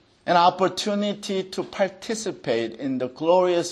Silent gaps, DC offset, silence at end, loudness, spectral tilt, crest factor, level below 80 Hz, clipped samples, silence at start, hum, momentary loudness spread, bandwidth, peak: none; under 0.1%; 0 s; -23 LUFS; -4.5 dB/octave; 18 dB; -68 dBFS; under 0.1%; 0.25 s; none; 9 LU; 12.5 kHz; -4 dBFS